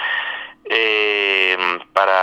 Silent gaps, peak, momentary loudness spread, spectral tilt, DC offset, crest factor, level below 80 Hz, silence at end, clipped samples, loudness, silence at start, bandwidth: none; 0 dBFS; 8 LU; -2 dB/octave; under 0.1%; 18 dB; -66 dBFS; 0 s; under 0.1%; -17 LUFS; 0 s; 13.5 kHz